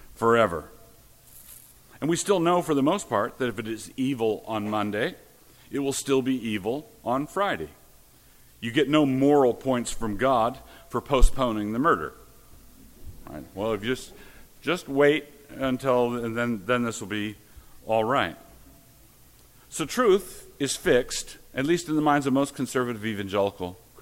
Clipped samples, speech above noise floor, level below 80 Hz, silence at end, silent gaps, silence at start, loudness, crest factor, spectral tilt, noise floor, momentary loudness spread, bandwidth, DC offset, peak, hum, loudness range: under 0.1%; 30 dB; -36 dBFS; 0 s; none; 0.2 s; -26 LUFS; 22 dB; -5 dB/octave; -55 dBFS; 13 LU; 17 kHz; under 0.1%; -4 dBFS; none; 5 LU